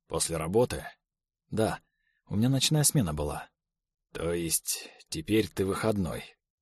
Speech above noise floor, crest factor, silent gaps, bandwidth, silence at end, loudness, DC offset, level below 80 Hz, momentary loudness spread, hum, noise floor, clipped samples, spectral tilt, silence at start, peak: 54 dB; 20 dB; none; 13 kHz; 0.3 s; -29 LUFS; under 0.1%; -50 dBFS; 16 LU; none; -83 dBFS; under 0.1%; -4.5 dB/octave; 0.1 s; -10 dBFS